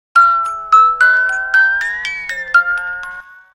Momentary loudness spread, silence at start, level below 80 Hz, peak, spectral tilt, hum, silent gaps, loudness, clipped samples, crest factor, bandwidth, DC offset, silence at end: 14 LU; 0.15 s; -50 dBFS; 0 dBFS; 0.5 dB/octave; none; none; -12 LUFS; under 0.1%; 14 dB; 16 kHz; under 0.1%; 0.3 s